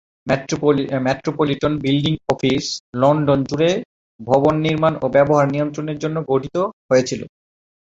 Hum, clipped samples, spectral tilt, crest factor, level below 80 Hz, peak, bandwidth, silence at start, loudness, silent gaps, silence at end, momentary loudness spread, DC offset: none; under 0.1%; -6 dB/octave; 18 dB; -50 dBFS; -2 dBFS; 7.8 kHz; 0.25 s; -19 LUFS; 2.80-2.93 s, 3.85-4.19 s, 6.73-6.89 s; 0.55 s; 8 LU; under 0.1%